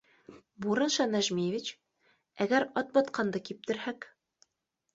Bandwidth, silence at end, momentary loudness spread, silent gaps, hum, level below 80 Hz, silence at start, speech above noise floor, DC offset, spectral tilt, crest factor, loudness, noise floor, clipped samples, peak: 8 kHz; 0.9 s; 11 LU; none; none; -74 dBFS; 0.3 s; 53 dB; under 0.1%; -4 dB/octave; 20 dB; -31 LUFS; -83 dBFS; under 0.1%; -12 dBFS